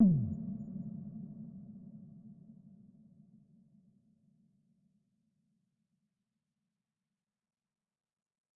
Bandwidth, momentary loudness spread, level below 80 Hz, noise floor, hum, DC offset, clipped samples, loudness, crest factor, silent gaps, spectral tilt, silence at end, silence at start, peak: 1.2 kHz; 23 LU; -66 dBFS; under -90 dBFS; none; under 0.1%; under 0.1%; -38 LUFS; 24 dB; none; -16.5 dB/octave; 6.05 s; 0 s; -16 dBFS